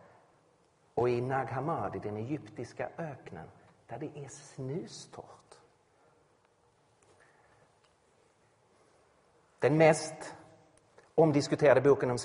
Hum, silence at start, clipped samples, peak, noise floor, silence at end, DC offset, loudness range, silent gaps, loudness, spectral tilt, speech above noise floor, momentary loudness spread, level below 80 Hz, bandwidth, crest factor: none; 0.95 s; under 0.1%; -10 dBFS; -69 dBFS; 0 s; under 0.1%; 18 LU; none; -30 LUFS; -6 dB/octave; 38 dB; 22 LU; -68 dBFS; 10.5 kHz; 24 dB